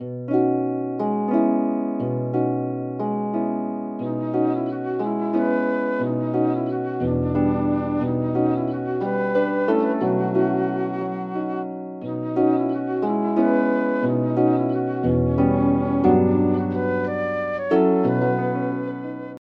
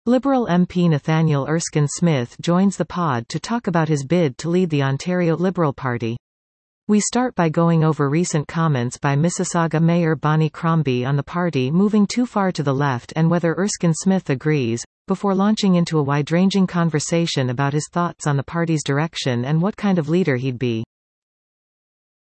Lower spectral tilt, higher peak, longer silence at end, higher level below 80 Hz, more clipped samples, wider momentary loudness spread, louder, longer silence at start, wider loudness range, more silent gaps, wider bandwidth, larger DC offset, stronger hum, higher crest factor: first, -11 dB/octave vs -6 dB/octave; about the same, -6 dBFS vs -4 dBFS; second, 0 s vs 1.5 s; first, -48 dBFS vs -56 dBFS; neither; first, 8 LU vs 5 LU; about the same, -22 LUFS vs -20 LUFS; about the same, 0 s vs 0.05 s; about the same, 4 LU vs 2 LU; second, none vs 6.19-6.87 s, 14.86-15.05 s; second, 5 kHz vs 8.8 kHz; neither; neither; about the same, 16 dB vs 14 dB